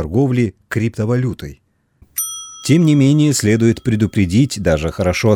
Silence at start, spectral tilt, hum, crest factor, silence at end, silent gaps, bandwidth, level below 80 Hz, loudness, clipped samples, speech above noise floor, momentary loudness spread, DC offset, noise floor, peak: 0 s; -6 dB/octave; none; 14 dB; 0 s; none; 19 kHz; -38 dBFS; -16 LUFS; under 0.1%; 38 dB; 11 LU; under 0.1%; -52 dBFS; -2 dBFS